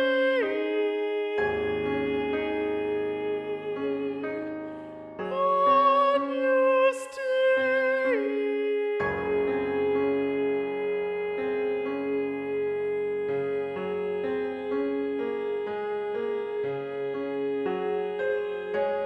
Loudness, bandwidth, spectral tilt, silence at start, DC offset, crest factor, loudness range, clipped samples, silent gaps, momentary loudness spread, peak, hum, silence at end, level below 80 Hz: -27 LUFS; 10.5 kHz; -6 dB/octave; 0 s; under 0.1%; 16 dB; 6 LU; under 0.1%; none; 8 LU; -12 dBFS; none; 0 s; -62 dBFS